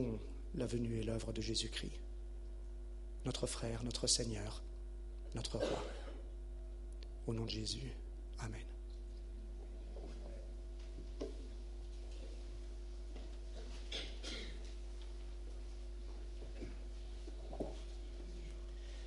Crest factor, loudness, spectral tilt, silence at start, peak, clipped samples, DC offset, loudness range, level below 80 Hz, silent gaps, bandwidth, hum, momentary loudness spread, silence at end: 24 dB; -46 LUFS; -4 dB/octave; 0 s; -20 dBFS; under 0.1%; under 0.1%; 10 LU; -48 dBFS; none; 11.5 kHz; none; 11 LU; 0 s